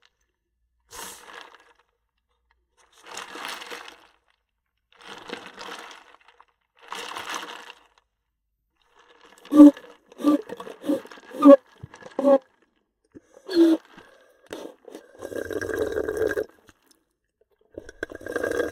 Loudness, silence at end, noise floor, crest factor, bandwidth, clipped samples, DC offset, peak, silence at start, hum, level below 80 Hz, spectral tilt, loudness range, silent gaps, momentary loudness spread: -21 LUFS; 0 s; -78 dBFS; 26 dB; 14.5 kHz; under 0.1%; under 0.1%; 0 dBFS; 0.95 s; none; -62 dBFS; -5 dB/octave; 22 LU; none; 28 LU